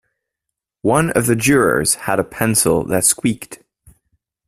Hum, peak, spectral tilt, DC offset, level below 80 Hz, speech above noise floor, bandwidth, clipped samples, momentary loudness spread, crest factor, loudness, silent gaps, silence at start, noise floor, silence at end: none; 0 dBFS; -4 dB/octave; under 0.1%; -46 dBFS; 65 dB; 16 kHz; under 0.1%; 8 LU; 18 dB; -16 LUFS; none; 0.85 s; -81 dBFS; 0.9 s